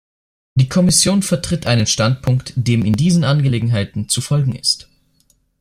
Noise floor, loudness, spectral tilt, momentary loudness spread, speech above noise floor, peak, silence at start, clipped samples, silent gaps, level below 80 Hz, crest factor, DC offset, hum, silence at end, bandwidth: -59 dBFS; -16 LUFS; -4.5 dB/octave; 7 LU; 44 dB; 0 dBFS; 0.55 s; under 0.1%; none; -42 dBFS; 16 dB; under 0.1%; none; 0.8 s; 15 kHz